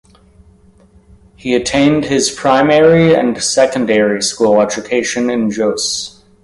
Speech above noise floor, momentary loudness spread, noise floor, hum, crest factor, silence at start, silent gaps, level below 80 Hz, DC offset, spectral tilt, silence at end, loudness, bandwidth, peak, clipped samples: 34 dB; 8 LU; -46 dBFS; none; 14 dB; 1.45 s; none; -46 dBFS; under 0.1%; -4 dB/octave; 0.35 s; -13 LUFS; 11.5 kHz; 0 dBFS; under 0.1%